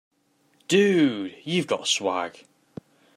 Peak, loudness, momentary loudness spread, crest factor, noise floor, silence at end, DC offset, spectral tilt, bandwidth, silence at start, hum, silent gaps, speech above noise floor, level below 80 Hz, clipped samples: -6 dBFS; -23 LUFS; 13 LU; 20 dB; -65 dBFS; 0.85 s; under 0.1%; -4 dB/octave; 13 kHz; 0.7 s; none; none; 42 dB; -74 dBFS; under 0.1%